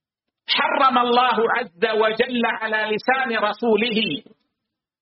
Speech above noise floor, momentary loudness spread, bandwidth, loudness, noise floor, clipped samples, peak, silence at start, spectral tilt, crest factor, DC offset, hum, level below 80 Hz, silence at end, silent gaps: 62 dB; 6 LU; 5.8 kHz; -20 LUFS; -82 dBFS; under 0.1%; -4 dBFS; 0.5 s; -1 dB/octave; 16 dB; under 0.1%; none; -68 dBFS; 0.8 s; none